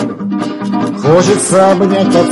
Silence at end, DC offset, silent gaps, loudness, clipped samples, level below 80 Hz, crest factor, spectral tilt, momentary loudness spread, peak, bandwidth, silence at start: 0 s; under 0.1%; none; -11 LUFS; 0.7%; -48 dBFS; 10 dB; -5.5 dB/octave; 9 LU; 0 dBFS; 11.5 kHz; 0 s